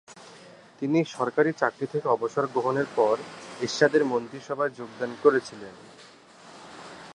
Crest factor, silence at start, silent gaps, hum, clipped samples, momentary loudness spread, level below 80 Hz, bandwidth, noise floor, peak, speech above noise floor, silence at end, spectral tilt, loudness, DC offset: 22 dB; 0.1 s; none; none; under 0.1%; 22 LU; -74 dBFS; 10.5 kHz; -51 dBFS; -6 dBFS; 25 dB; 0.05 s; -5.5 dB/octave; -26 LUFS; under 0.1%